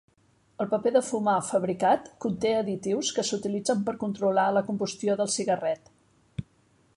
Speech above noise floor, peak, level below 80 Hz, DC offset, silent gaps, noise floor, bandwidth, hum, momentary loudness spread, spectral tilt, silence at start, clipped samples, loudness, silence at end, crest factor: 38 dB; -10 dBFS; -62 dBFS; under 0.1%; none; -65 dBFS; 11.5 kHz; none; 9 LU; -4.5 dB/octave; 0.6 s; under 0.1%; -27 LUFS; 0.55 s; 18 dB